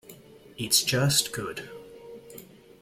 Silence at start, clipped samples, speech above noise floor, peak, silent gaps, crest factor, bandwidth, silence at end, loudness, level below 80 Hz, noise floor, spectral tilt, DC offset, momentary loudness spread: 0.05 s; under 0.1%; 23 dB; -8 dBFS; none; 22 dB; 16.5 kHz; 0.4 s; -24 LUFS; -60 dBFS; -50 dBFS; -2.5 dB/octave; under 0.1%; 24 LU